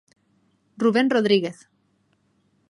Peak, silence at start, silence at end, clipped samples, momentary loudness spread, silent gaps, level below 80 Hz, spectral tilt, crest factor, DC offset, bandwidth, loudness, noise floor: -6 dBFS; 0.8 s; 1.2 s; under 0.1%; 6 LU; none; -74 dBFS; -6 dB/octave; 20 dB; under 0.1%; 11 kHz; -21 LUFS; -66 dBFS